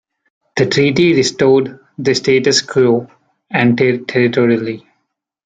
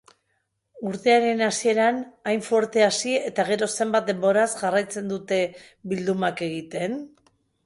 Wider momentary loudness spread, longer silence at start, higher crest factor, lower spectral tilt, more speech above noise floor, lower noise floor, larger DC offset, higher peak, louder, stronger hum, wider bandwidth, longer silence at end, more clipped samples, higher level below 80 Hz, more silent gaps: about the same, 9 LU vs 10 LU; second, 0.55 s vs 0.75 s; about the same, 14 dB vs 18 dB; about the same, -5 dB/octave vs -4 dB/octave; first, 57 dB vs 51 dB; second, -70 dBFS vs -74 dBFS; neither; first, -2 dBFS vs -6 dBFS; first, -13 LUFS vs -23 LUFS; neither; second, 9.2 kHz vs 11.5 kHz; about the same, 0.7 s vs 0.6 s; neither; first, -54 dBFS vs -68 dBFS; neither